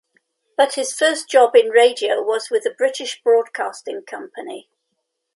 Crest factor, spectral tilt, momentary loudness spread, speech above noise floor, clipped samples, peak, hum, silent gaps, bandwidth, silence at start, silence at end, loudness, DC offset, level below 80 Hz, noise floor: 18 dB; 0 dB/octave; 19 LU; 57 dB; under 0.1%; 0 dBFS; none; none; 11.5 kHz; 0.6 s; 0.75 s; -17 LUFS; under 0.1%; -80 dBFS; -75 dBFS